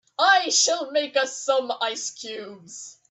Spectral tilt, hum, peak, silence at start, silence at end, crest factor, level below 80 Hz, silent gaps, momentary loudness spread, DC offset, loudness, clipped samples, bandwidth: 1 dB/octave; none; -4 dBFS; 0.2 s; 0.2 s; 20 dB; -82 dBFS; none; 21 LU; under 0.1%; -22 LUFS; under 0.1%; 8.6 kHz